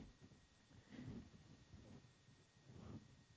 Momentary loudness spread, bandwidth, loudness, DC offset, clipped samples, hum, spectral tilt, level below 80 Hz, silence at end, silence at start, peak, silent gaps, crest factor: 12 LU; 8 kHz; -62 LUFS; under 0.1%; under 0.1%; none; -6 dB/octave; -72 dBFS; 0 s; 0 s; -44 dBFS; none; 18 dB